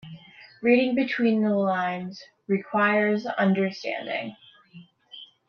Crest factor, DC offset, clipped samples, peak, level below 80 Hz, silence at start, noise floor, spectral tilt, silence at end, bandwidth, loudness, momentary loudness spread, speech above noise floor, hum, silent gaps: 18 dB; under 0.1%; under 0.1%; -8 dBFS; -74 dBFS; 0.05 s; -51 dBFS; -7.5 dB/octave; 0.25 s; 6.8 kHz; -24 LUFS; 22 LU; 27 dB; none; none